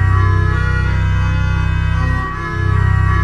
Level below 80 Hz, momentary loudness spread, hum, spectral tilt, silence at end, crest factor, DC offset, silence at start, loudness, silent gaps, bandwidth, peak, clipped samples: -20 dBFS; 5 LU; none; -7.5 dB/octave; 0 s; 12 dB; 0.3%; 0 s; -16 LUFS; none; 7 kHz; -2 dBFS; under 0.1%